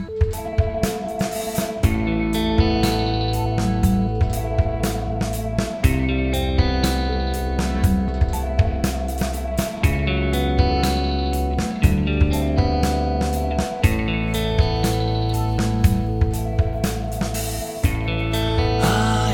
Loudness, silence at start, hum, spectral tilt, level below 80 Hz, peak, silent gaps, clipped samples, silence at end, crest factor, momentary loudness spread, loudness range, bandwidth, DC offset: -21 LUFS; 0 s; none; -6 dB/octave; -26 dBFS; -2 dBFS; none; under 0.1%; 0 s; 18 dB; 5 LU; 2 LU; 18 kHz; under 0.1%